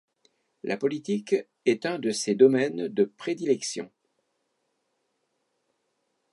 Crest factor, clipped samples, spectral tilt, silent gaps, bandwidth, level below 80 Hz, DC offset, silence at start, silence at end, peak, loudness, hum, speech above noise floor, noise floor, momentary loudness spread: 22 dB; under 0.1%; -4.5 dB/octave; none; 11.5 kHz; -82 dBFS; under 0.1%; 0.65 s; 2.45 s; -6 dBFS; -26 LUFS; none; 51 dB; -76 dBFS; 13 LU